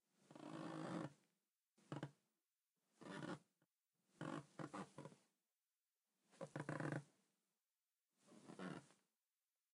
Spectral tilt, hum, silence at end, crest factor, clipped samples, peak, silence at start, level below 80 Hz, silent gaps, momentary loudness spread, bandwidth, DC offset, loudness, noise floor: -6 dB/octave; none; 0.8 s; 24 dB; under 0.1%; -32 dBFS; 0.2 s; under -90 dBFS; none; 12 LU; 11 kHz; under 0.1%; -54 LUFS; under -90 dBFS